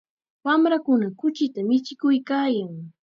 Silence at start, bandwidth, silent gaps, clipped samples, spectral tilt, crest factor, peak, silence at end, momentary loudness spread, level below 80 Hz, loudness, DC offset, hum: 0.45 s; 7 kHz; none; under 0.1%; -6.5 dB/octave; 14 dB; -8 dBFS; 0.15 s; 7 LU; -78 dBFS; -23 LUFS; under 0.1%; none